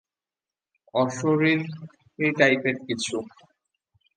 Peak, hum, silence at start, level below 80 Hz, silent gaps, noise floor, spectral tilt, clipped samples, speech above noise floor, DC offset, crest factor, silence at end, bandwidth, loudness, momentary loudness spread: -4 dBFS; none; 0.95 s; -70 dBFS; none; under -90 dBFS; -5 dB/octave; under 0.1%; over 66 dB; under 0.1%; 22 dB; 0.9 s; 9.8 kHz; -24 LUFS; 15 LU